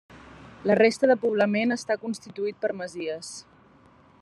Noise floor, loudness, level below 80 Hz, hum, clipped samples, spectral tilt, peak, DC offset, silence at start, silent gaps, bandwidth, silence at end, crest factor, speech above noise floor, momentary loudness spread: -56 dBFS; -25 LUFS; -66 dBFS; none; under 0.1%; -5 dB/octave; -6 dBFS; under 0.1%; 0.1 s; none; 12 kHz; 0.8 s; 20 dB; 31 dB; 14 LU